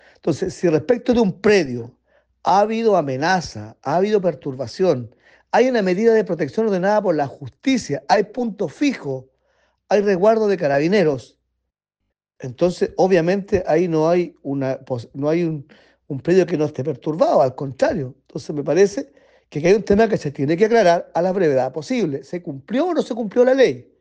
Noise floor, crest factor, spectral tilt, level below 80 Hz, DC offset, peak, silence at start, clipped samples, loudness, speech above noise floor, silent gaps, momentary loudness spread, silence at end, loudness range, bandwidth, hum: -78 dBFS; 16 dB; -6.5 dB/octave; -52 dBFS; under 0.1%; -4 dBFS; 0.25 s; under 0.1%; -19 LUFS; 59 dB; none; 12 LU; 0.2 s; 3 LU; 9.2 kHz; none